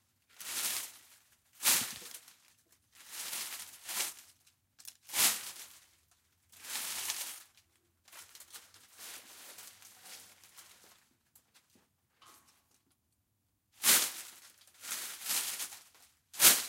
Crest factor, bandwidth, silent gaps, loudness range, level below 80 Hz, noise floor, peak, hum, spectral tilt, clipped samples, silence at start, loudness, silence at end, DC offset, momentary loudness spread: 30 dB; 16.5 kHz; none; 19 LU; -84 dBFS; -79 dBFS; -8 dBFS; none; 2 dB/octave; under 0.1%; 0.4 s; -32 LUFS; 0 s; under 0.1%; 25 LU